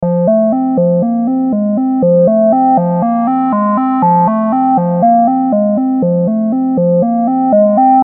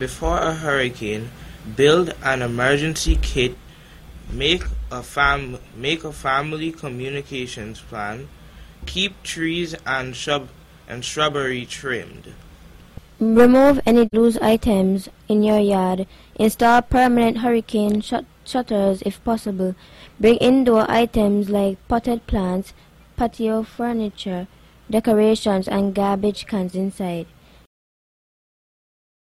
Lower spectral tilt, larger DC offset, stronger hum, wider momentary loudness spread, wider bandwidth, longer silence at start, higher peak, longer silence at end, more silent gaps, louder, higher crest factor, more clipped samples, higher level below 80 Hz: first, -15 dB/octave vs -5.5 dB/octave; neither; neither; second, 4 LU vs 14 LU; second, 3 kHz vs 15 kHz; about the same, 0 s vs 0 s; about the same, 0 dBFS vs -2 dBFS; second, 0 s vs 2 s; neither; first, -11 LUFS vs -20 LUFS; second, 10 dB vs 18 dB; neither; second, -56 dBFS vs -36 dBFS